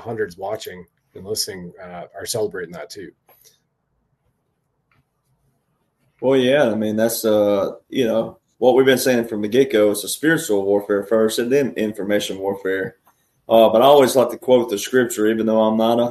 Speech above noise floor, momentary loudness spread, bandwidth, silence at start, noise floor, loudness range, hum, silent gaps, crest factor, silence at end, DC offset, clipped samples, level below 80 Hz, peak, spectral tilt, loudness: 52 dB; 17 LU; 13.5 kHz; 0 s; -70 dBFS; 13 LU; none; none; 18 dB; 0 s; under 0.1%; under 0.1%; -62 dBFS; 0 dBFS; -4.5 dB/octave; -18 LUFS